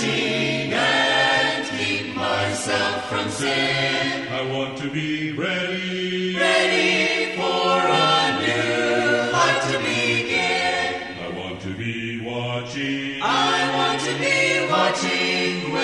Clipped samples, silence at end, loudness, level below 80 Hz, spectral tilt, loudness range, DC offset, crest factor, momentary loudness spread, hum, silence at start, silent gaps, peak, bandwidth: under 0.1%; 0 s; -21 LUFS; -58 dBFS; -3.5 dB/octave; 4 LU; under 0.1%; 16 dB; 9 LU; none; 0 s; none; -6 dBFS; 11.5 kHz